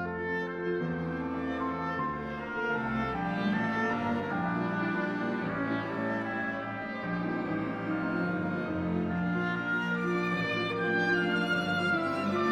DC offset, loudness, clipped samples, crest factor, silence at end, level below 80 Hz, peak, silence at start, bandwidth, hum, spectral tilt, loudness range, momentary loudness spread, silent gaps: under 0.1%; -31 LUFS; under 0.1%; 14 dB; 0 s; -58 dBFS; -16 dBFS; 0 s; 9 kHz; none; -7 dB/octave; 3 LU; 5 LU; none